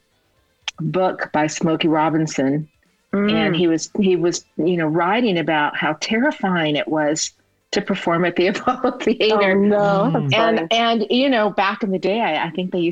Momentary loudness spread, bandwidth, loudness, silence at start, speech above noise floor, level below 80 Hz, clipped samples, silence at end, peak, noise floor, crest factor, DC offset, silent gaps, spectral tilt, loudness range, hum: 6 LU; 8.8 kHz; -19 LUFS; 0.65 s; 44 dB; -58 dBFS; under 0.1%; 0 s; -4 dBFS; -62 dBFS; 14 dB; under 0.1%; none; -5 dB/octave; 3 LU; none